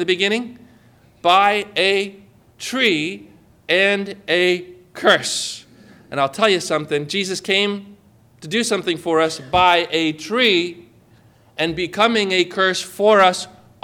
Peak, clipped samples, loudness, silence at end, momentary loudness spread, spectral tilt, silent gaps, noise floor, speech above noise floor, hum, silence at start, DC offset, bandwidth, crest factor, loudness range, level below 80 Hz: -2 dBFS; under 0.1%; -18 LUFS; 0.35 s; 13 LU; -3 dB/octave; none; -51 dBFS; 33 dB; none; 0 s; under 0.1%; 17 kHz; 16 dB; 2 LU; -54 dBFS